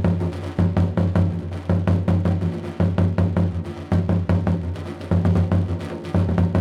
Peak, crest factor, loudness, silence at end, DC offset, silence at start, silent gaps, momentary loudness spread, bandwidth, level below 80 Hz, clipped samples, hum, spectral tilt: -8 dBFS; 12 dB; -22 LUFS; 0 s; under 0.1%; 0 s; none; 7 LU; 6.2 kHz; -38 dBFS; under 0.1%; none; -9.5 dB/octave